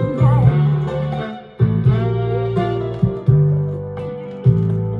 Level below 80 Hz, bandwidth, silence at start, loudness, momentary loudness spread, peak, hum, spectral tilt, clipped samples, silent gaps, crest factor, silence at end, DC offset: -36 dBFS; 4.6 kHz; 0 s; -18 LUFS; 12 LU; -2 dBFS; none; -10.5 dB/octave; under 0.1%; none; 16 dB; 0 s; under 0.1%